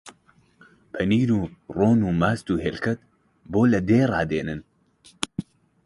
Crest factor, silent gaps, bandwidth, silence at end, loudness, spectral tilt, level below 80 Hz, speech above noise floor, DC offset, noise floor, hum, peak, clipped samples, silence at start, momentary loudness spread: 22 dB; none; 11.5 kHz; 0.45 s; -23 LUFS; -7 dB/octave; -48 dBFS; 37 dB; under 0.1%; -59 dBFS; none; -2 dBFS; under 0.1%; 0.05 s; 13 LU